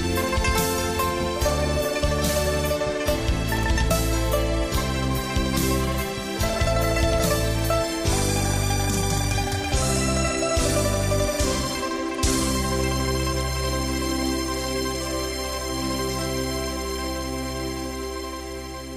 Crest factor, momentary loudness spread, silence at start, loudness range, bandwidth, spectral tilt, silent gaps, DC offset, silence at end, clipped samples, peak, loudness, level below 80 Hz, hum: 14 dB; 6 LU; 0 s; 4 LU; 15.5 kHz; -4 dB/octave; none; under 0.1%; 0 s; under 0.1%; -10 dBFS; -24 LUFS; -30 dBFS; none